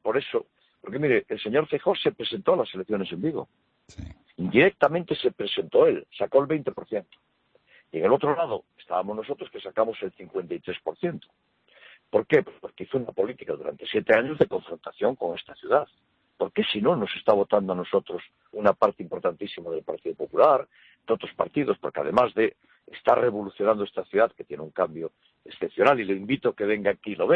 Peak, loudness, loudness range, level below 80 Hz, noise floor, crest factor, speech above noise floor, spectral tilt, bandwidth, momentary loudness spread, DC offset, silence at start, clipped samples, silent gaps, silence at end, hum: -6 dBFS; -26 LUFS; 5 LU; -62 dBFS; -60 dBFS; 20 dB; 35 dB; -7.5 dB/octave; 6.6 kHz; 14 LU; under 0.1%; 0.05 s; under 0.1%; none; 0 s; none